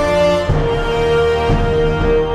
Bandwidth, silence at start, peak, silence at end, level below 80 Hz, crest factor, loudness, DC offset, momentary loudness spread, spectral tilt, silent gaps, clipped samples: 12 kHz; 0 s; -2 dBFS; 0 s; -22 dBFS; 12 dB; -15 LUFS; under 0.1%; 3 LU; -6.5 dB/octave; none; under 0.1%